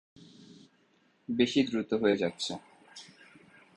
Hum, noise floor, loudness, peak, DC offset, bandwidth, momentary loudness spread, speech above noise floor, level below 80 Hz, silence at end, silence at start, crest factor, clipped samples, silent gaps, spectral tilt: none; -68 dBFS; -30 LUFS; -10 dBFS; under 0.1%; 11 kHz; 23 LU; 39 dB; -68 dBFS; 0.7 s; 0.2 s; 22 dB; under 0.1%; none; -5 dB/octave